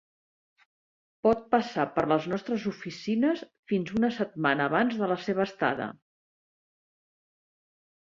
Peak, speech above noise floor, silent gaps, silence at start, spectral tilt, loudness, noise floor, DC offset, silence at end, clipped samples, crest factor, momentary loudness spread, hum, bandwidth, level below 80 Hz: -8 dBFS; over 62 dB; 3.59-3.63 s; 1.25 s; -6.5 dB/octave; -28 LUFS; under -90 dBFS; under 0.1%; 2.25 s; under 0.1%; 20 dB; 7 LU; none; 7.4 kHz; -66 dBFS